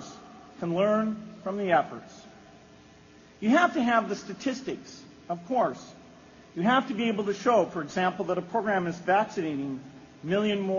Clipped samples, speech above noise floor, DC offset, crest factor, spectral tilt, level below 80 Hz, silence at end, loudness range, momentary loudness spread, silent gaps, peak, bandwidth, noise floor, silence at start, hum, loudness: under 0.1%; 26 dB; under 0.1%; 20 dB; -4 dB/octave; -66 dBFS; 0 s; 3 LU; 19 LU; none; -8 dBFS; 7.2 kHz; -54 dBFS; 0 s; none; -27 LUFS